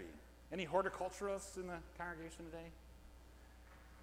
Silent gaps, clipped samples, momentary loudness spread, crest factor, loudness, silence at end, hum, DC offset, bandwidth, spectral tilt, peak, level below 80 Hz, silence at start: none; under 0.1%; 23 LU; 24 dB; -45 LUFS; 0 s; none; under 0.1%; 16.5 kHz; -4.5 dB/octave; -22 dBFS; -62 dBFS; 0 s